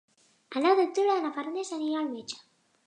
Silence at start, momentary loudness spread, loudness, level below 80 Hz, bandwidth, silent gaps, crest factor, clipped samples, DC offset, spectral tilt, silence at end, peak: 0.5 s; 15 LU; -28 LUFS; -86 dBFS; 10 kHz; none; 18 dB; under 0.1%; under 0.1%; -3 dB/octave; 0.5 s; -10 dBFS